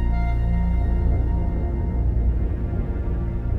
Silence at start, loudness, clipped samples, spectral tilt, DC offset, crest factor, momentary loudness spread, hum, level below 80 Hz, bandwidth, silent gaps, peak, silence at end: 0 s; -24 LUFS; under 0.1%; -10.5 dB/octave; under 0.1%; 10 dB; 4 LU; none; -22 dBFS; 3.7 kHz; none; -12 dBFS; 0 s